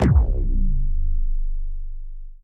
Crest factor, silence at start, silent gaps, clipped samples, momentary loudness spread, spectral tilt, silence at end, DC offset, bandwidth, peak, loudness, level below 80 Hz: 12 dB; 0 s; none; under 0.1%; 19 LU; -9 dB/octave; 0.1 s; under 0.1%; 3.2 kHz; -6 dBFS; -26 LUFS; -20 dBFS